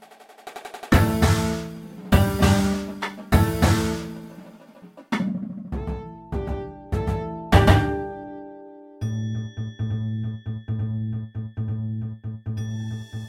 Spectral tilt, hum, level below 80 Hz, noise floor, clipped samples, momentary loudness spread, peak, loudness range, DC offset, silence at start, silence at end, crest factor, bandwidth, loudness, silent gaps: -6 dB/octave; none; -34 dBFS; -46 dBFS; under 0.1%; 19 LU; -2 dBFS; 8 LU; under 0.1%; 0 s; 0 s; 24 dB; 16.5 kHz; -24 LUFS; none